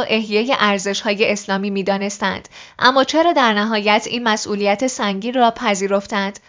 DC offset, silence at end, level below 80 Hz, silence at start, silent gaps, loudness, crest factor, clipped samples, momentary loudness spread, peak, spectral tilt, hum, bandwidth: under 0.1%; 0.15 s; -58 dBFS; 0 s; none; -17 LUFS; 18 dB; under 0.1%; 7 LU; 0 dBFS; -3.5 dB/octave; none; 7.6 kHz